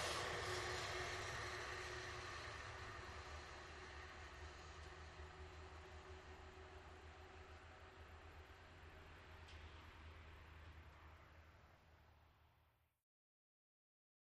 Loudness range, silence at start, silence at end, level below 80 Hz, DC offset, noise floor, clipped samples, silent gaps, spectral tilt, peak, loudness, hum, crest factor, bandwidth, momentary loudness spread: 15 LU; 0 s; 1.65 s; -64 dBFS; under 0.1%; -79 dBFS; under 0.1%; none; -3 dB/octave; -32 dBFS; -53 LUFS; none; 22 dB; 13 kHz; 16 LU